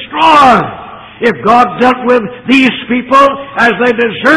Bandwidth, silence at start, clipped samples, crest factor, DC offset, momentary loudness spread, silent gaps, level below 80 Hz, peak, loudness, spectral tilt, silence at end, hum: 11.5 kHz; 0 s; 2%; 8 dB; under 0.1%; 9 LU; none; -42 dBFS; 0 dBFS; -8 LUFS; -5 dB/octave; 0 s; none